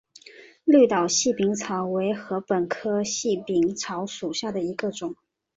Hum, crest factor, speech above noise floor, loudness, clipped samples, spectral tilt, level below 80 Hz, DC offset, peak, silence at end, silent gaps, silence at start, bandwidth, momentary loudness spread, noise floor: none; 18 dB; 25 dB; -24 LUFS; under 0.1%; -4 dB/octave; -66 dBFS; under 0.1%; -6 dBFS; 0.45 s; none; 0.25 s; 8 kHz; 12 LU; -49 dBFS